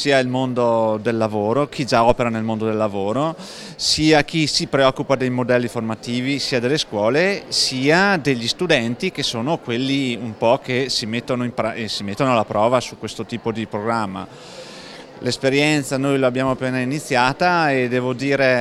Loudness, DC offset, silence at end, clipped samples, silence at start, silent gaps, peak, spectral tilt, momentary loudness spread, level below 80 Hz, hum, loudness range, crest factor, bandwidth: -19 LUFS; under 0.1%; 0 s; under 0.1%; 0 s; none; 0 dBFS; -4.5 dB/octave; 9 LU; -48 dBFS; none; 4 LU; 18 dB; 14.5 kHz